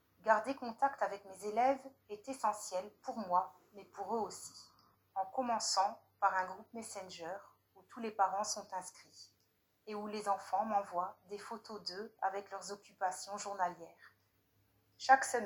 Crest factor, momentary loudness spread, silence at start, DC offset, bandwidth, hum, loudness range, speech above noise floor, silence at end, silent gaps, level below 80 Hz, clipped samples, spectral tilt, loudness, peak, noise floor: 26 dB; 16 LU; 0.25 s; under 0.1%; 17.5 kHz; none; 4 LU; 39 dB; 0 s; none; -86 dBFS; under 0.1%; -2 dB/octave; -38 LUFS; -12 dBFS; -77 dBFS